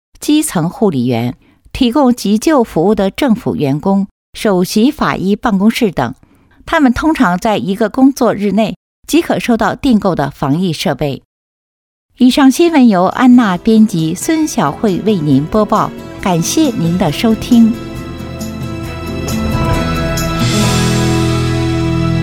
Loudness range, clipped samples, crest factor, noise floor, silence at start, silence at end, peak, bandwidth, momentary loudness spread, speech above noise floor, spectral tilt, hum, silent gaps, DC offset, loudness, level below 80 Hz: 4 LU; under 0.1%; 12 dB; under -90 dBFS; 0.2 s; 0 s; 0 dBFS; 18 kHz; 11 LU; over 79 dB; -5.5 dB/octave; none; 4.11-4.33 s, 8.76-9.03 s, 11.25-12.09 s; under 0.1%; -13 LUFS; -32 dBFS